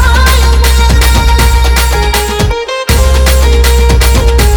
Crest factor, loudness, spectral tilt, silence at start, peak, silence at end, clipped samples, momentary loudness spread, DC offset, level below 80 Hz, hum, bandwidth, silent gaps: 6 dB; -8 LUFS; -4 dB/octave; 0 s; 0 dBFS; 0 s; 0.3%; 4 LU; under 0.1%; -8 dBFS; none; over 20 kHz; none